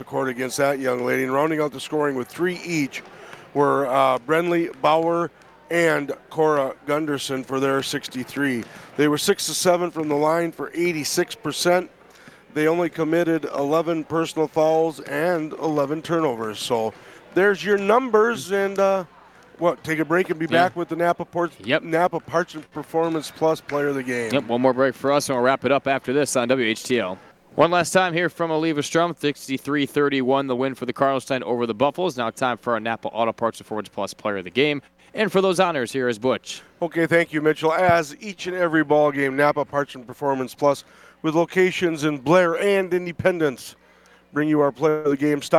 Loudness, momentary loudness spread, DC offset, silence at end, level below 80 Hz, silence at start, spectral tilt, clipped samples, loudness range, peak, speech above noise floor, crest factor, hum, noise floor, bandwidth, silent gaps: -22 LUFS; 8 LU; under 0.1%; 0 s; -64 dBFS; 0 s; -4.5 dB/octave; under 0.1%; 3 LU; -4 dBFS; 32 dB; 18 dB; none; -54 dBFS; 16.5 kHz; none